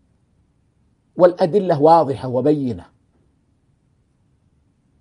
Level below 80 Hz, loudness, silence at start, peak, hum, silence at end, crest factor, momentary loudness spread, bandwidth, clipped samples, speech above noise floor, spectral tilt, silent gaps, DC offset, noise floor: -60 dBFS; -16 LUFS; 1.15 s; 0 dBFS; none; 2.2 s; 20 dB; 14 LU; 10.5 kHz; under 0.1%; 46 dB; -8.5 dB/octave; none; under 0.1%; -61 dBFS